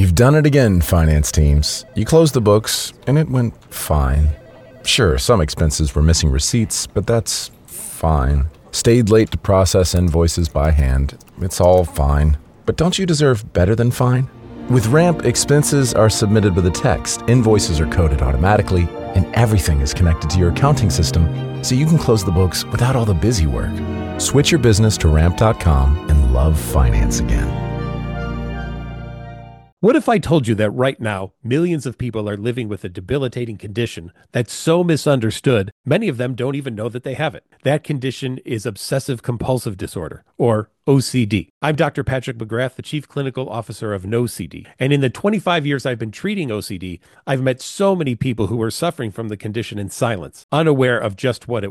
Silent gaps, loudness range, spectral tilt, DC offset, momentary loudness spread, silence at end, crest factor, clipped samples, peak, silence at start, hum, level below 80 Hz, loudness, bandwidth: 29.72-29.77 s, 35.72-35.84 s, 41.50-41.61 s, 50.44-50.49 s; 6 LU; -5.5 dB/octave; under 0.1%; 11 LU; 0 s; 16 dB; under 0.1%; 0 dBFS; 0 s; none; -24 dBFS; -17 LUFS; 17.5 kHz